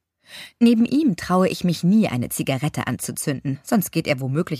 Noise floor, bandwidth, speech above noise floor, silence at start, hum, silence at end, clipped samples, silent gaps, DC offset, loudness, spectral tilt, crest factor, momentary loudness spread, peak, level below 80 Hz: -43 dBFS; 15.5 kHz; 22 dB; 0.3 s; none; 0 s; under 0.1%; none; under 0.1%; -21 LUFS; -6 dB/octave; 16 dB; 8 LU; -4 dBFS; -54 dBFS